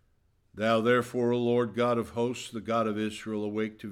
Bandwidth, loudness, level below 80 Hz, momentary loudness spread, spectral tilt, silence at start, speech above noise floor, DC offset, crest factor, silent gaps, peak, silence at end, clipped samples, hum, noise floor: 14.5 kHz; -29 LUFS; -66 dBFS; 8 LU; -6 dB/octave; 0.55 s; 40 dB; under 0.1%; 18 dB; none; -12 dBFS; 0 s; under 0.1%; none; -68 dBFS